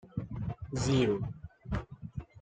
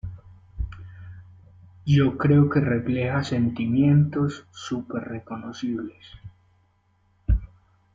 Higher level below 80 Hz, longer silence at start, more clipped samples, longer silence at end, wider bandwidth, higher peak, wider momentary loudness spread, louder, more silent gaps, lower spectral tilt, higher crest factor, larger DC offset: second, -50 dBFS vs -38 dBFS; about the same, 0.05 s vs 0.05 s; neither; second, 0 s vs 0.5 s; first, 9.4 kHz vs 7.6 kHz; second, -16 dBFS vs -8 dBFS; second, 16 LU vs 21 LU; second, -34 LUFS vs -23 LUFS; neither; second, -6 dB/octave vs -8 dB/octave; about the same, 18 dB vs 16 dB; neither